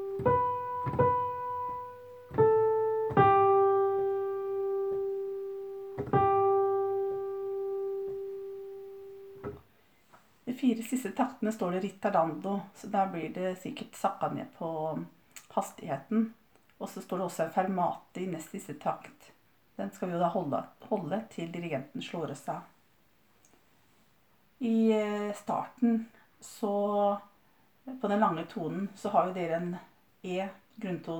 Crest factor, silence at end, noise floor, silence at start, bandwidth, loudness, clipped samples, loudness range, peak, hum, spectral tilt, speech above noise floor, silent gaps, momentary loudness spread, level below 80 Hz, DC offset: 20 dB; 0 s; -68 dBFS; 0 s; over 20 kHz; -31 LUFS; under 0.1%; 10 LU; -12 dBFS; none; -7 dB/octave; 36 dB; none; 16 LU; -64 dBFS; under 0.1%